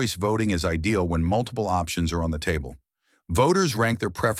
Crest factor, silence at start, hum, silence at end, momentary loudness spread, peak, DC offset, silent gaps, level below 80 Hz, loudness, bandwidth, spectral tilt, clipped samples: 18 dB; 0 s; none; 0 s; 7 LU; -6 dBFS; under 0.1%; none; -38 dBFS; -24 LUFS; 16 kHz; -5.5 dB/octave; under 0.1%